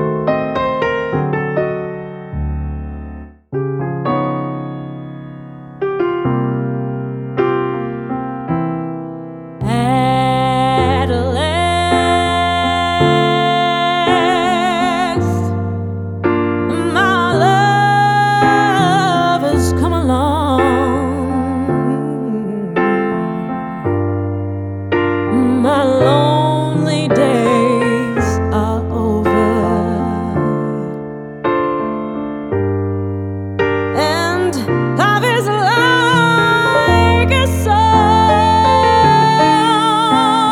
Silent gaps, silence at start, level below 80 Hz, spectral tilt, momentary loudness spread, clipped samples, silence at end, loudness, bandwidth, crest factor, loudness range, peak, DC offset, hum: none; 0 s; -34 dBFS; -6 dB/octave; 12 LU; under 0.1%; 0 s; -15 LUFS; 17.5 kHz; 14 dB; 9 LU; -2 dBFS; under 0.1%; none